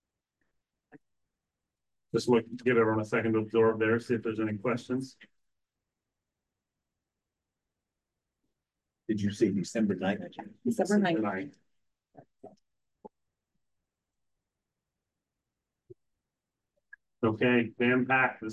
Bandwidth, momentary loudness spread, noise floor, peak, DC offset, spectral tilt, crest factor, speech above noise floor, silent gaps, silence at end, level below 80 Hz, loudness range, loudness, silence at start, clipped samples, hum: 12.5 kHz; 10 LU; -88 dBFS; -14 dBFS; under 0.1%; -6.5 dB/octave; 20 dB; 60 dB; none; 0 s; -68 dBFS; 12 LU; -29 LUFS; 0.95 s; under 0.1%; none